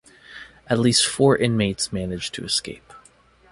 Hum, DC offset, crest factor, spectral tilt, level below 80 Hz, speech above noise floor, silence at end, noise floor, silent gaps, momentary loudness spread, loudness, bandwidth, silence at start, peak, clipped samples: none; under 0.1%; 20 dB; -4 dB/octave; -50 dBFS; 33 dB; 0.55 s; -54 dBFS; none; 23 LU; -21 LUFS; 11.5 kHz; 0.3 s; -4 dBFS; under 0.1%